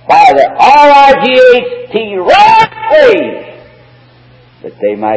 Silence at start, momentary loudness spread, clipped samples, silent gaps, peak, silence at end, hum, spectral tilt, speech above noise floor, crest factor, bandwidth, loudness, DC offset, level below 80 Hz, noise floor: 0.1 s; 13 LU; 8%; none; 0 dBFS; 0 s; none; -4 dB/octave; 35 dB; 8 dB; 8 kHz; -6 LUFS; under 0.1%; -44 dBFS; -40 dBFS